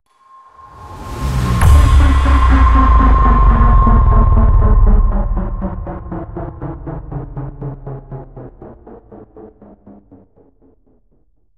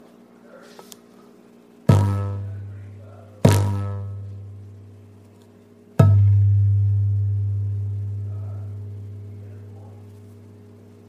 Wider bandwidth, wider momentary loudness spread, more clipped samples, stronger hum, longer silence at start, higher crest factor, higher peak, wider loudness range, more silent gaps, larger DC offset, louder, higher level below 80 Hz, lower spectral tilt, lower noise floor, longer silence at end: second, 12 kHz vs 13.5 kHz; second, 19 LU vs 25 LU; neither; neither; first, 0.8 s vs 0.55 s; second, 14 dB vs 22 dB; about the same, 0 dBFS vs -2 dBFS; first, 19 LU vs 9 LU; neither; neither; first, -13 LUFS vs -21 LUFS; first, -14 dBFS vs -52 dBFS; about the same, -7.5 dB/octave vs -7.5 dB/octave; first, -58 dBFS vs -49 dBFS; first, 2.1 s vs 0.6 s